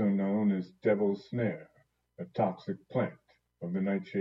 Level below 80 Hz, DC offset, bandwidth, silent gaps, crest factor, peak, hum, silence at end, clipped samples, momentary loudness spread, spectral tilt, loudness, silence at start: -76 dBFS; under 0.1%; 5.8 kHz; none; 16 dB; -16 dBFS; none; 0 s; under 0.1%; 12 LU; -10 dB/octave; -32 LUFS; 0 s